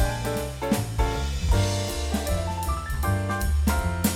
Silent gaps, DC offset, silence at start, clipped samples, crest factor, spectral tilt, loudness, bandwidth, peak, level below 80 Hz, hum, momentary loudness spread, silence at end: none; under 0.1%; 0 s; under 0.1%; 18 dB; -5 dB/octave; -26 LUFS; 17.5 kHz; -8 dBFS; -28 dBFS; none; 5 LU; 0 s